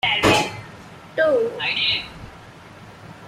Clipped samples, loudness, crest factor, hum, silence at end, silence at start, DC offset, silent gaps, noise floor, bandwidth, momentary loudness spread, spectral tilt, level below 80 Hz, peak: under 0.1%; -20 LUFS; 20 dB; none; 0 s; 0.05 s; under 0.1%; none; -42 dBFS; 16 kHz; 24 LU; -3.5 dB/octave; -48 dBFS; -4 dBFS